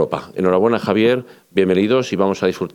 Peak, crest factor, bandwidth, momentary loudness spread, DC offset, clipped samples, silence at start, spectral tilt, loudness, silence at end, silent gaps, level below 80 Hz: -2 dBFS; 16 dB; 13.5 kHz; 6 LU; under 0.1%; under 0.1%; 0 s; -6.5 dB/octave; -17 LUFS; 0.05 s; none; -60 dBFS